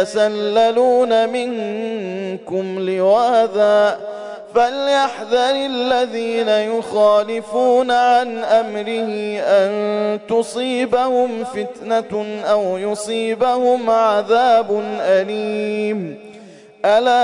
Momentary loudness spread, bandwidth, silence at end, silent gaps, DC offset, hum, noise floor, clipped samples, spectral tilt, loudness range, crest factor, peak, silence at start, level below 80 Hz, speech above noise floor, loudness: 10 LU; 11 kHz; 0 s; none; under 0.1%; none; -41 dBFS; under 0.1%; -4.5 dB/octave; 2 LU; 12 dB; -4 dBFS; 0 s; -62 dBFS; 24 dB; -17 LUFS